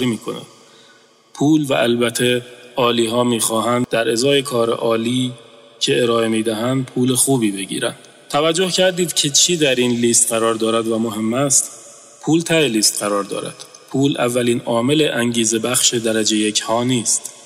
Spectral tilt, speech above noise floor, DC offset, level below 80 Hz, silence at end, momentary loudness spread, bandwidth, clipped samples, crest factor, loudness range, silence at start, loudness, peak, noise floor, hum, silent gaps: -3 dB/octave; 33 dB; under 0.1%; -60 dBFS; 0.05 s; 9 LU; 16 kHz; under 0.1%; 14 dB; 3 LU; 0 s; -17 LUFS; -4 dBFS; -50 dBFS; none; none